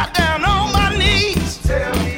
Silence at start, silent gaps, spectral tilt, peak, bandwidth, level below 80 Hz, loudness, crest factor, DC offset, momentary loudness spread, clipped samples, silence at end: 0 s; none; -4.5 dB/octave; -2 dBFS; 18.5 kHz; -24 dBFS; -16 LUFS; 14 dB; under 0.1%; 6 LU; under 0.1%; 0 s